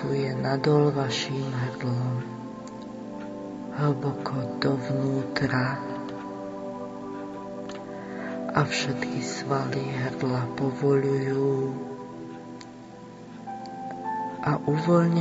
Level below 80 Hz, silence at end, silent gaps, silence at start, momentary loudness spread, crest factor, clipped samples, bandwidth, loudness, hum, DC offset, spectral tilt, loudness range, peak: -62 dBFS; 0 s; none; 0 s; 15 LU; 24 dB; under 0.1%; 8 kHz; -28 LUFS; none; under 0.1%; -6.5 dB/octave; 5 LU; -4 dBFS